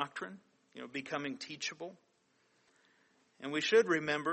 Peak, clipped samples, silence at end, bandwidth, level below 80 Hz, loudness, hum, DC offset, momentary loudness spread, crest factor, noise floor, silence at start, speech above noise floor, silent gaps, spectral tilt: -16 dBFS; under 0.1%; 0 s; 8.4 kHz; -84 dBFS; -34 LUFS; none; under 0.1%; 20 LU; 20 dB; -74 dBFS; 0 s; 39 dB; none; -3.5 dB/octave